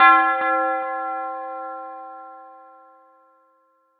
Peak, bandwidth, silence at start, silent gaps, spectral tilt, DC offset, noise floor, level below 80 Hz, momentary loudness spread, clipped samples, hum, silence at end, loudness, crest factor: -2 dBFS; 4.8 kHz; 0 s; none; 3 dB/octave; under 0.1%; -63 dBFS; -84 dBFS; 23 LU; under 0.1%; none; 1.45 s; -21 LUFS; 22 dB